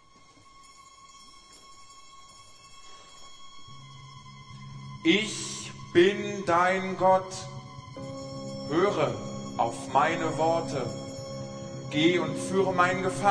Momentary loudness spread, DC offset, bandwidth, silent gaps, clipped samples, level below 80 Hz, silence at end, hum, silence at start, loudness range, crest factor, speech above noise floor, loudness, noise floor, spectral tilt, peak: 23 LU; under 0.1%; 11 kHz; none; under 0.1%; -60 dBFS; 0 s; none; 0.6 s; 21 LU; 20 dB; 30 dB; -27 LUFS; -55 dBFS; -4.5 dB/octave; -8 dBFS